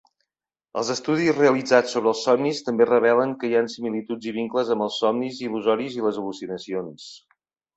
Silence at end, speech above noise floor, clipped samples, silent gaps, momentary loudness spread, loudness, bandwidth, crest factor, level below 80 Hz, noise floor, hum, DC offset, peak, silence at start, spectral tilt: 0.6 s; 63 dB; under 0.1%; none; 13 LU; -23 LUFS; 8.2 kHz; 20 dB; -68 dBFS; -85 dBFS; none; under 0.1%; -2 dBFS; 0.75 s; -5 dB/octave